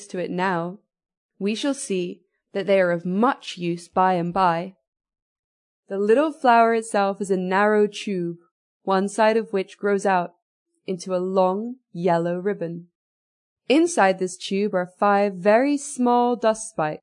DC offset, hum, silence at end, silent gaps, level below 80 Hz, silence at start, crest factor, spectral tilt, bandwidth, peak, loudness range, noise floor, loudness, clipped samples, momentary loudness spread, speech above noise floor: under 0.1%; none; 0.05 s; 1.17-1.29 s, 4.87-4.93 s, 5.22-5.83 s, 8.51-8.80 s, 10.42-10.66 s, 12.95-13.56 s; -68 dBFS; 0 s; 18 dB; -5.5 dB/octave; 11 kHz; -4 dBFS; 4 LU; under -90 dBFS; -22 LUFS; under 0.1%; 12 LU; over 69 dB